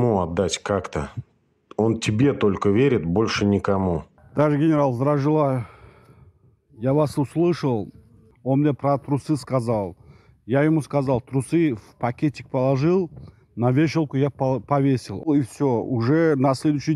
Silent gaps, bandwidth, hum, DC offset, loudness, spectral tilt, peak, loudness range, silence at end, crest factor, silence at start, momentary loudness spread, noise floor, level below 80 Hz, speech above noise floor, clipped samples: none; 12 kHz; none; under 0.1%; -22 LUFS; -7 dB/octave; -4 dBFS; 3 LU; 0 s; 16 dB; 0 s; 9 LU; -55 dBFS; -50 dBFS; 35 dB; under 0.1%